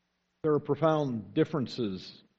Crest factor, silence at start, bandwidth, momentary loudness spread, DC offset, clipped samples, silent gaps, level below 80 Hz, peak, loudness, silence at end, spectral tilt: 20 dB; 0.45 s; 7.6 kHz; 8 LU; under 0.1%; under 0.1%; none; -68 dBFS; -12 dBFS; -30 LUFS; 0.25 s; -8 dB/octave